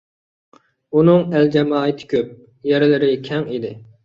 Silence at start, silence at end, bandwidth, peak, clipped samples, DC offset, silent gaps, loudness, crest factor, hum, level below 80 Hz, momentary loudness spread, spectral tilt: 0.9 s; 0.2 s; 7 kHz; -2 dBFS; under 0.1%; under 0.1%; none; -17 LUFS; 16 dB; none; -60 dBFS; 13 LU; -8.5 dB/octave